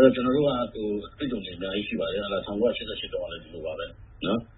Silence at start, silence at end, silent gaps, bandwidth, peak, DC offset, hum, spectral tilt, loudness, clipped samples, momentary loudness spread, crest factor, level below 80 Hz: 0 s; 0.05 s; none; 4.1 kHz; -4 dBFS; under 0.1%; none; -10 dB/octave; -29 LUFS; under 0.1%; 12 LU; 22 dB; -50 dBFS